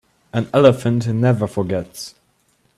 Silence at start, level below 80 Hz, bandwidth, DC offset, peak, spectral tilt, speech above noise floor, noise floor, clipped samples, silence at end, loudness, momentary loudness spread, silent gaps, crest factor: 0.35 s; -54 dBFS; 13.5 kHz; under 0.1%; 0 dBFS; -7 dB/octave; 45 dB; -62 dBFS; under 0.1%; 0.7 s; -18 LUFS; 18 LU; none; 18 dB